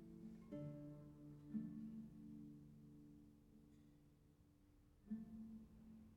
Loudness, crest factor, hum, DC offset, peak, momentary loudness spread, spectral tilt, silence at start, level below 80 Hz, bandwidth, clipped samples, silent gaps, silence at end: -57 LUFS; 20 dB; none; under 0.1%; -38 dBFS; 16 LU; -9 dB/octave; 0 s; -74 dBFS; 11.5 kHz; under 0.1%; none; 0 s